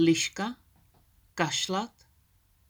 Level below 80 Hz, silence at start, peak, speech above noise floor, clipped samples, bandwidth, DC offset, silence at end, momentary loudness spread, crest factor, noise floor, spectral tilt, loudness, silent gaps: -66 dBFS; 0 s; -12 dBFS; 38 dB; under 0.1%; over 20 kHz; under 0.1%; 0.85 s; 16 LU; 20 dB; -66 dBFS; -3.5 dB/octave; -30 LUFS; none